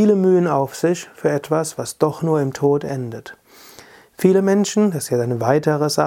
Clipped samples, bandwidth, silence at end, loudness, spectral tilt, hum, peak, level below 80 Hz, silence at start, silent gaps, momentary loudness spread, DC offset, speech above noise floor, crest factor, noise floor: under 0.1%; 17 kHz; 0 s; -19 LUFS; -6 dB/octave; none; -2 dBFS; -62 dBFS; 0 s; none; 7 LU; under 0.1%; 27 dB; 18 dB; -45 dBFS